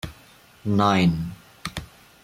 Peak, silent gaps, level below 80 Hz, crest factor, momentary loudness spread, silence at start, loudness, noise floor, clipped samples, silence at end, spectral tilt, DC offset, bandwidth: -6 dBFS; none; -48 dBFS; 18 dB; 18 LU; 0.05 s; -23 LUFS; -52 dBFS; under 0.1%; 0.4 s; -6.5 dB/octave; under 0.1%; 16 kHz